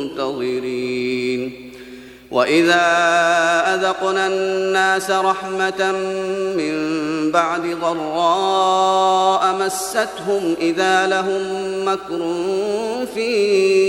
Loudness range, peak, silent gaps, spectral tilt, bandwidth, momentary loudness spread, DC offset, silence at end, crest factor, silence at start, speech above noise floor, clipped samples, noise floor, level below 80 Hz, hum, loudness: 3 LU; -2 dBFS; none; -3.5 dB/octave; 13.5 kHz; 8 LU; under 0.1%; 0 s; 16 dB; 0 s; 20 dB; under 0.1%; -38 dBFS; -58 dBFS; none; -18 LUFS